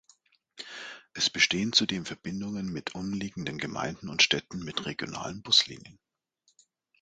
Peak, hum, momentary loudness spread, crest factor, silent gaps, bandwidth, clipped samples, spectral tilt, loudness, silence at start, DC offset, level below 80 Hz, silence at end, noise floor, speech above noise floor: -6 dBFS; none; 18 LU; 26 dB; none; 9.4 kHz; under 0.1%; -2.5 dB/octave; -28 LUFS; 0.55 s; under 0.1%; -62 dBFS; 1.1 s; -72 dBFS; 42 dB